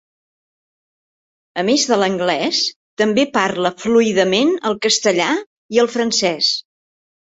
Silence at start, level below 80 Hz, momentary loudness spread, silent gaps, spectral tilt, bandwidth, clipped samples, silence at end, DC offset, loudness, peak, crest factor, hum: 1.55 s; -62 dBFS; 6 LU; 2.76-2.97 s, 5.46-5.69 s; -3 dB/octave; 8.2 kHz; under 0.1%; 0.7 s; under 0.1%; -17 LUFS; -2 dBFS; 16 dB; none